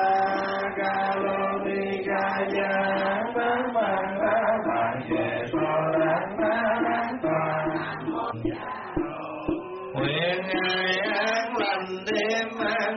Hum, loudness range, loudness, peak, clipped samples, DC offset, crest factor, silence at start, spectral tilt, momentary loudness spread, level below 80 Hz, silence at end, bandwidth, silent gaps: none; 3 LU; -26 LUFS; -12 dBFS; under 0.1%; under 0.1%; 14 dB; 0 s; -3 dB/octave; 7 LU; -56 dBFS; 0 s; 6.2 kHz; none